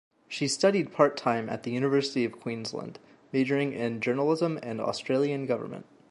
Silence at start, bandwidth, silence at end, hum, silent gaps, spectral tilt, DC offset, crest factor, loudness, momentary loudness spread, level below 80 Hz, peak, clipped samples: 0.3 s; 11.5 kHz; 0.3 s; none; none; -5 dB/octave; under 0.1%; 22 dB; -28 LUFS; 11 LU; -74 dBFS; -6 dBFS; under 0.1%